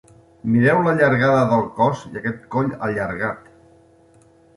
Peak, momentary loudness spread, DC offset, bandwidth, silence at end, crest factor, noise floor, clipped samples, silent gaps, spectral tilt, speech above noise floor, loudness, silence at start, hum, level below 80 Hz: -4 dBFS; 12 LU; under 0.1%; 11.5 kHz; 1.2 s; 16 dB; -52 dBFS; under 0.1%; none; -8 dB/octave; 34 dB; -19 LUFS; 0.45 s; none; -54 dBFS